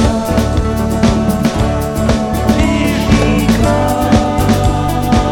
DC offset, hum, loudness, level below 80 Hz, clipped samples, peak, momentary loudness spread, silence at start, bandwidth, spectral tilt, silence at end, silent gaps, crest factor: under 0.1%; none; -13 LUFS; -20 dBFS; under 0.1%; 0 dBFS; 3 LU; 0 s; 18.5 kHz; -6 dB/octave; 0 s; none; 12 dB